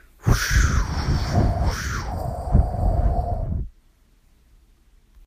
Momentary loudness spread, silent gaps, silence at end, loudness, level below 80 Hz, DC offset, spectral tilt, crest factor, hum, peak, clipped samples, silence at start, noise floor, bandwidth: 9 LU; none; 1.6 s; -23 LUFS; -26 dBFS; under 0.1%; -5.5 dB/octave; 18 dB; none; -4 dBFS; under 0.1%; 0.25 s; -57 dBFS; 15.5 kHz